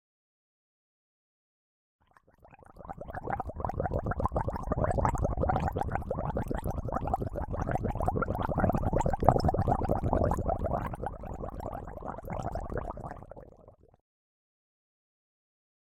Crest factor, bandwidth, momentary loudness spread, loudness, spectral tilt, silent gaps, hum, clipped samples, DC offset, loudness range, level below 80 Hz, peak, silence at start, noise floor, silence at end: 30 dB; 16 kHz; 12 LU; -32 LUFS; -8.5 dB/octave; none; none; under 0.1%; under 0.1%; 13 LU; -40 dBFS; -4 dBFS; 2.5 s; -61 dBFS; 2.25 s